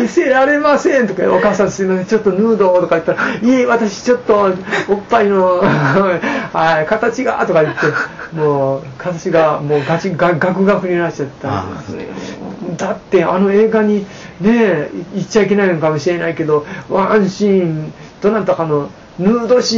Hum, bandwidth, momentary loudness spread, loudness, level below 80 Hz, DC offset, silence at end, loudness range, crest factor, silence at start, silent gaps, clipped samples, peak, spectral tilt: none; 7.6 kHz; 10 LU; -14 LUFS; -48 dBFS; under 0.1%; 0 s; 3 LU; 12 dB; 0 s; none; under 0.1%; -2 dBFS; -5 dB/octave